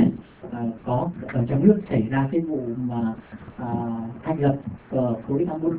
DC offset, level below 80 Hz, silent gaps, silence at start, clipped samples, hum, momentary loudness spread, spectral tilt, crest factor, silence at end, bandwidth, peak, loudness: under 0.1%; -50 dBFS; none; 0 s; under 0.1%; none; 12 LU; -13 dB/octave; 20 dB; 0 s; 4 kHz; -4 dBFS; -25 LUFS